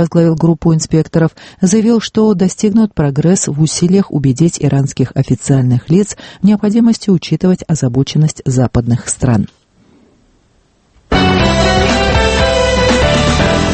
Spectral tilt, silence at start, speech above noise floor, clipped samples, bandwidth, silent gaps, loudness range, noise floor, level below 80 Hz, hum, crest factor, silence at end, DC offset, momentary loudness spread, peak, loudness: -5.5 dB/octave; 0 s; 41 dB; under 0.1%; 8.8 kHz; none; 4 LU; -53 dBFS; -26 dBFS; none; 12 dB; 0 s; under 0.1%; 4 LU; 0 dBFS; -12 LUFS